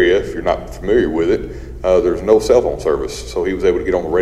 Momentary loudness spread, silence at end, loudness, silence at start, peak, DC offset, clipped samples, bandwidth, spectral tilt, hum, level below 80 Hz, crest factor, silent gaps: 8 LU; 0 s; -16 LUFS; 0 s; 0 dBFS; under 0.1%; under 0.1%; 13 kHz; -5.5 dB/octave; none; -32 dBFS; 16 dB; none